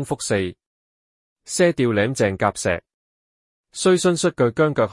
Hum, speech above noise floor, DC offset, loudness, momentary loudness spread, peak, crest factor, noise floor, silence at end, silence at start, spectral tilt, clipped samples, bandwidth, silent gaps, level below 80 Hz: none; over 70 dB; under 0.1%; -20 LUFS; 10 LU; -4 dBFS; 18 dB; under -90 dBFS; 0 s; 0 s; -5 dB/octave; under 0.1%; 12 kHz; 0.66-1.36 s, 2.94-3.64 s; -56 dBFS